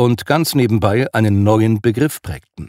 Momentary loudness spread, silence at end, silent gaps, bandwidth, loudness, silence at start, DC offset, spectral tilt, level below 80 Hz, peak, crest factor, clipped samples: 6 LU; 0 s; none; 16 kHz; -15 LUFS; 0 s; under 0.1%; -6.5 dB/octave; -44 dBFS; 0 dBFS; 14 dB; under 0.1%